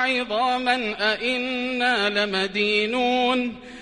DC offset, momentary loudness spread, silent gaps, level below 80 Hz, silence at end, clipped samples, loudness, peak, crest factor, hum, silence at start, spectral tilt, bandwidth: under 0.1%; 4 LU; none; -56 dBFS; 0 s; under 0.1%; -22 LUFS; -8 dBFS; 16 dB; none; 0 s; -3.5 dB/octave; 11 kHz